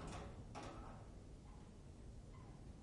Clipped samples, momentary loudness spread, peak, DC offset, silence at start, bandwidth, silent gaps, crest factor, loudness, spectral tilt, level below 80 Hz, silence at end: under 0.1%; 6 LU; -40 dBFS; under 0.1%; 0 s; 11 kHz; none; 16 dB; -57 LUFS; -6 dB/octave; -60 dBFS; 0 s